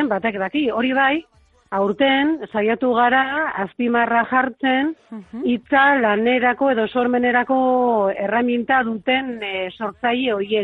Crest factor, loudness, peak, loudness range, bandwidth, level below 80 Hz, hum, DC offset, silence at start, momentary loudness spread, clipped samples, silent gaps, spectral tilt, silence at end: 16 dB; -19 LUFS; -4 dBFS; 2 LU; 4.2 kHz; -58 dBFS; none; under 0.1%; 0 s; 9 LU; under 0.1%; none; -7.5 dB/octave; 0 s